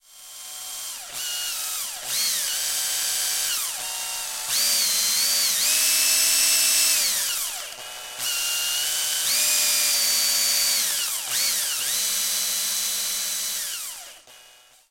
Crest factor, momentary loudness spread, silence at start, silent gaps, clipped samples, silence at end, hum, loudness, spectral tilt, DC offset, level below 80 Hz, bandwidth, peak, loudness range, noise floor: 18 dB; 14 LU; 0.15 s; none; under 0.1%; 0.5 s; none; -21 LUFS; 3.5 dB/octave; under 0.1%; -64 dBFS; 16.5 kHz; -6 dBFS; 6 LU; -52 dBFS